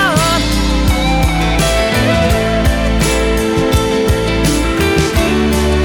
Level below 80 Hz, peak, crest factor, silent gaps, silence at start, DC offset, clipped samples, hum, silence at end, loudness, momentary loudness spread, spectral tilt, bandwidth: -18 dBFS; -2 dBFS; 10 dB; none; 0 s; under 0.1%; under 0.1%; none; 0 s; -13 LUFS; 2 LU; -5 dB/octave; 18.5 kHz